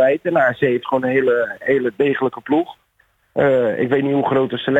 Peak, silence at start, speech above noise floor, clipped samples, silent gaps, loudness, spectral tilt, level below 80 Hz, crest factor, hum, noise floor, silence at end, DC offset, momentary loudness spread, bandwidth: -2 dBFS; 0 s; 44 dB; under 0.1%; none; -18 LUFS; -8 dB/octave; -58 dBFS; 14 dB; none; -61 dBFS; 0 s; under 0.1%; 4 LU; 7.8 kHz